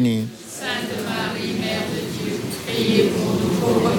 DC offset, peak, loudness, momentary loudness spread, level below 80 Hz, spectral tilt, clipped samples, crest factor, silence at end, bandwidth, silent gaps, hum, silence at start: under 0.1%; -4 dBFS; -22 LUFS; 8 LU; -52 dBFS; -5 dB/octave; under 0.1%; 18 dB; 0 s; 17.5 kHz; none; none; 0 s